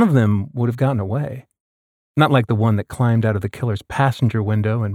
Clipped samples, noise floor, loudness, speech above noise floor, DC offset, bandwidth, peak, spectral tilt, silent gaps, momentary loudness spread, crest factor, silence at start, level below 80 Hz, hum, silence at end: under 0.1%; under -90 dBFS; -19 LUFS; over 72 dB; under 0.1%; 13 kHz; -4 dBFS; -8 dB/octave; 1.60-2.14 s; 9 LU; 14 dB; 0 s; -50 dBFS; none; 0 s